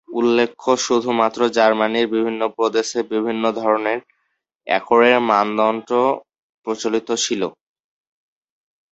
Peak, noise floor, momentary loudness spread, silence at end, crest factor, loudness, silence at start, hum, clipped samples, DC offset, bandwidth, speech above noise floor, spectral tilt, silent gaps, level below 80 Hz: 0 dBFS; -72 dBFS; 9 LU; 1.4 s; 18 dB; -19 LUFS; 0.1 s; none; under 0.1%; under 0.1%; 8.2 kHz; 54 dB; -3.5 dB/octave; 6.39-6.62 s; -64 dBFS